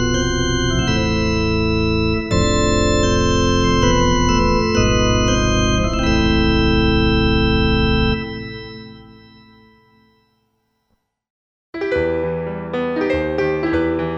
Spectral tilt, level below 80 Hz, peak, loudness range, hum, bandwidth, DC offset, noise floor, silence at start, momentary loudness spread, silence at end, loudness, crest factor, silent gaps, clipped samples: -5 dB/octave; -26 dBFS; -2 dBFS; 11 LU; none; 7.4 kHz; under 0.1%; -68 dBFS; 0 s; 8 LU; 0 s; -17 LUFS; 14 dB; 11.30-11.73 s; under 0.1%